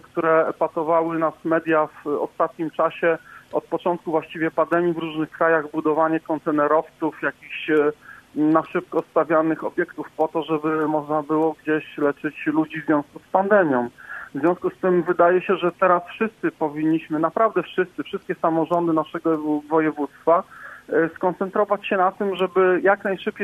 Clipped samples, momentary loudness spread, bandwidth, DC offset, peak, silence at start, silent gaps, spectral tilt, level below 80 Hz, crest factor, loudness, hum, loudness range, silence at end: under 0.1%; 8 LU; 5.4 kHz; under 0.1%; -4 dBFS; 0.15 s; none; -8 dB/octave; -66 dBFS; 18 dB; -22 LUFS; none; 2 LU; 0 s